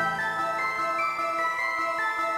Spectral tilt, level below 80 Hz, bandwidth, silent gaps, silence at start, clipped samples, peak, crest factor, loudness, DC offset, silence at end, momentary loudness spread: -3 dB/octave; -66 dBFS; 16 kHz; none; 0 s; under 0.1%; -16 dBFS; 12 dB; -26 LUFS; under 0.1%; 0 s; 1 LU